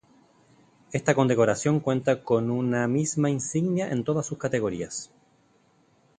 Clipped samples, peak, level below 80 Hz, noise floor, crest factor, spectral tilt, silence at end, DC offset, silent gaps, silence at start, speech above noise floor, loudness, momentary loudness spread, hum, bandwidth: under 0.1%; -4 dBFS; -62 dBFS; -63 dBFS; 22 dB; -6 dB/octave; 1.15 s; under 0.1%; none; 0.9 s; 38 dB; -25 LUFS; 9 LU; none; 10 kHz